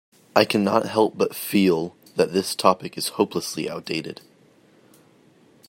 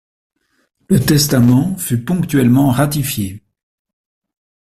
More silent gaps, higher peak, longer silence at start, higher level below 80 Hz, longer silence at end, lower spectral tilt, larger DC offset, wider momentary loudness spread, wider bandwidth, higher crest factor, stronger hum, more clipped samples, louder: neither; about the same, 0 dBFS vs -2 dBFS; second, 0.35 s vs 0.9 s; second, -68 dBFS vs -42 dBFS; first, 1.55 s vs 1.25 s; about the same, -4.5 dB/octave vs -5.5 dB/octave; neither; about the same, 10 LU vs 8 LU; about the same, 16.5 kHz vs 16 kHz; first, 24 dB vs 14 dB; neither; neither; second, -22 LUFS vs -14 LUFS